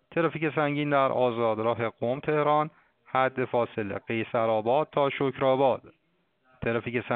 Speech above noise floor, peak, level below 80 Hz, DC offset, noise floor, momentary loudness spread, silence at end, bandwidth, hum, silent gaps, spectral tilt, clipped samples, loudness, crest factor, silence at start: 44 dB; -10 dBFS; -62 dBFS; under 0.1%; -70 dBFS; 7 LU; 0 s; 4.5 kHz; none; none; -5 dB/octave; under 0.1%; -27 LUFS; 18 dB; 0.1 s